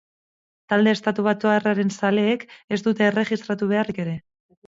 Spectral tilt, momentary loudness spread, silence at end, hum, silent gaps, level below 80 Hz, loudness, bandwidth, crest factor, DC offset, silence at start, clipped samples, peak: -6 dB/octave; 8 LU; 0.5 s; none; 2.64-2.68 s; -66 dBFS; -22 LUFS; 7.8 kHz; 16 dB; under 0.1%; 0.7 s; under 0.1%; -6 dBFS